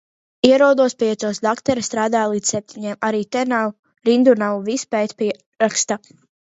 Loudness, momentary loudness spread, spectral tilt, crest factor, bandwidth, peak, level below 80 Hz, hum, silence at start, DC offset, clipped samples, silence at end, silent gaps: -19 LUFS; 10 LU; -3.5 dB/octave; 18 dB; 8 kHz; 0 dBFS; -60 dBFS; none; 0.45 s; under 0.1%; under 0.1%; 0.5 s; 3.79-3.83 s, 5.46-5.52 s